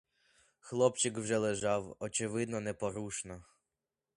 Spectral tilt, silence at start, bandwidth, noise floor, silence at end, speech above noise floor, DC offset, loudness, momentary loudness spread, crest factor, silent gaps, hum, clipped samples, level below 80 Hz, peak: -4 dB/octave; 0.65 s; 11.5 kHz; -90 dBFS; 0.75 s; 55 dB; under 0.1%; -35 LUFS; 11 LU; 22 dB; none; none; under 0.1%; -66 dBFS; -14 dBFS